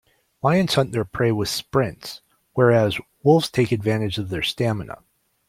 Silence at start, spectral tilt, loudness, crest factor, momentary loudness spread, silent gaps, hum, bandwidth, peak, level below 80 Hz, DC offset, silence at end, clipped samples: 0.45 s; -6 dB/octave; -21 LUFS; 18 dB; 14 LU; none; none; 16 kHz; -2 dBFS; -52 dBFS; under 0.1%; 0.55 s; under 0.1%